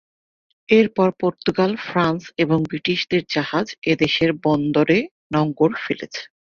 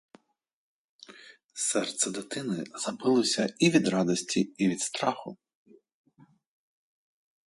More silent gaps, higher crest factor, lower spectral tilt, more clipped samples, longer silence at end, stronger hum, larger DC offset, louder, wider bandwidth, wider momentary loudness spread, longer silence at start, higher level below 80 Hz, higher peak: first, 3.78-3.82 s, 5.11-5.30 s vs 1.44-1.49 s; about the same, 18 dB vs 20 dB; first, -6.5 dB/octave vs -4 dB/octave; neither; second, 0.3 s vs 2.15 s; neither; neither; first, -20 LUFS vs -28 LUFS; second, 7.2 kHz vs 11.5 kHz; second, 7 LU vs 15 LU; second, 0.7 s vs 1.1 s; first, -56 dBFS vs -74 dBFS; first, -2 dBFS vs -10 dBFS